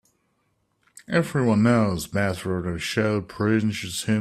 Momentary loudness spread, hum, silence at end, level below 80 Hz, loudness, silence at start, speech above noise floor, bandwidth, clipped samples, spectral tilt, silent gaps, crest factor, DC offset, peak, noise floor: 8 LU; none; 0 s; -54 dBFS; -23 LUFS; 1.1 s; 48 dB; 14.5 kHz; under 0.1%; -6 dB/octave; none; 16 dB; under 0.1%; -8 dBFS; -70 dBFS